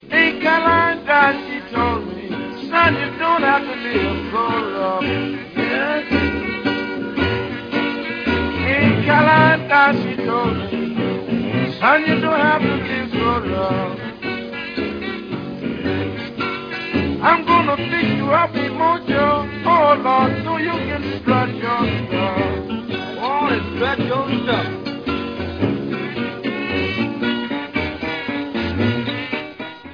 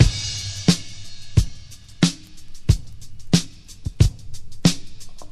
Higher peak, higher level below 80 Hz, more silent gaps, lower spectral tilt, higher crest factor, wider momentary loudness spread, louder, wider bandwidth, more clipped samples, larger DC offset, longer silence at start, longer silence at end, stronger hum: about the same, 0 dBFS vs 0 dBFS; second, -42 dBFS vs -30 dBFS; neither; first, -7.5 dB/octave vs -5 dB/octave; about the same, 18 dB vs 22 dB; second, 11 LU vs 22 LU; first, -19 LUFS vs -22 LUFS; second, 5.2 kHz vs 13.5 kHz; neither; neither; about the same, 0 s vs 0 s; about the same, 0 s vs 0.05 s; neither